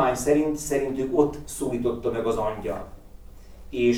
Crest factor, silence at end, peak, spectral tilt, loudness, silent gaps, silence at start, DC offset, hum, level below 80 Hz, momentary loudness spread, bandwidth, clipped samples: 18 dB; 0 s; -8 dBFS; -5.5 dB/octave; -26 LUFS; none; 0 s; under 0.1%; none; -44 dBFS; 11 LU; 18.5 kHz; under 0.1%